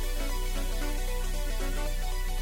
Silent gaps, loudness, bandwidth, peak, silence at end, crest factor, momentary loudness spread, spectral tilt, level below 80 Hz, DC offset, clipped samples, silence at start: none; -34 LUFS; 17 kHz; -18 dBFS; 0 s; 10 dB; 1 LU; -3.5 dB/octave; -28 dBFS; under 0.1%; under 0.1%; 0 s